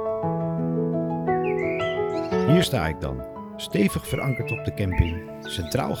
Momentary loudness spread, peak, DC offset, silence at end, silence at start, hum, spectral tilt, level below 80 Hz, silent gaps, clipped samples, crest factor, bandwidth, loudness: 11 LU; -6 dBFS; under 0.1%; 0 s; 0 s; none; -6.5 dB/octave; -40 dBFS; none; under 0.1%; 20 dB; 18.5 kHz; -25 LUFS